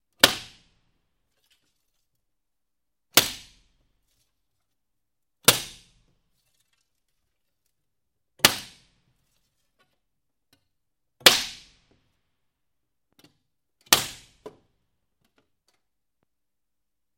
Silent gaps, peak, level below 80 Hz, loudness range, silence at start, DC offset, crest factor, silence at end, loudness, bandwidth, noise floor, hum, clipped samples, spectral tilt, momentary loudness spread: none; 0 dBFS; -60 dBFS; 4 LU; 0.25 s; under 0.1%; 30 dB; 2.7 s; -20 LUFS; 16.5 kHz; -86 dBFS; none; under 0.1%; -0.5 dB/octave; 19 LU